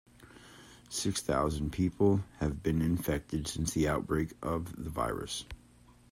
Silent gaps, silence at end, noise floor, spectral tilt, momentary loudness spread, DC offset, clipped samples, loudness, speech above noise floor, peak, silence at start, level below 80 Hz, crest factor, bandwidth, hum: none; 0.55 s; -60 dBFS; -5.5 dB/octave; 11 LU; under 0.1%; under 0.1%; -33 LUFS; 28 dB; -14 dBFS; 0.2 s; -48 dBFS; 20 dB; 16 kHz; none